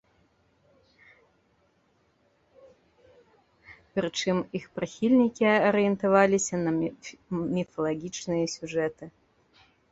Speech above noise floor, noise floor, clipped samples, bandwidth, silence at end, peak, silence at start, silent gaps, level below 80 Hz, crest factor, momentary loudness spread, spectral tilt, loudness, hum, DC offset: 42 dB; -68 dBFS; under 0.1%; 8.2 kHz; 0.8 s; -6 dBFS; 3.7 s; none; -64 dBFS; 22 dB; 13 LU; -5 dB/octave; -27 LUFS; none; under 0.1%